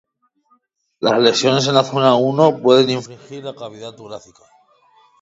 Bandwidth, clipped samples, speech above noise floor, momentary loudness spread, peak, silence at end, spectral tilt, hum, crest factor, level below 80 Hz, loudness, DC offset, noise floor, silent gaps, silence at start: 7.8 kHz; under 0.1%; 45 dB; 21 LU; 0 dBFS; 1.05 s; -5 dB/octave; none; 18 dB; -66 dBFS; -15 LUFS; under 0.1%; -61 dBFS; none; 1 s